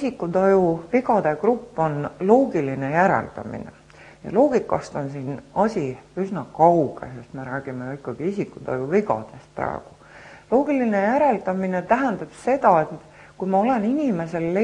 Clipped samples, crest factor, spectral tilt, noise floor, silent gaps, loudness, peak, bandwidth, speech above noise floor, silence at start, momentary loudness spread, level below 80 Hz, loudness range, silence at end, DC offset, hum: under 0.1%; 20 dB; -8 dB/octave; -45 dBFS; none; -22 LUFS; -2 dBFS; 10.5 kHz; 24 dB; 0 s; 14 LU; -56 dBFS; 4 LU; 0 s; under 0.1%; none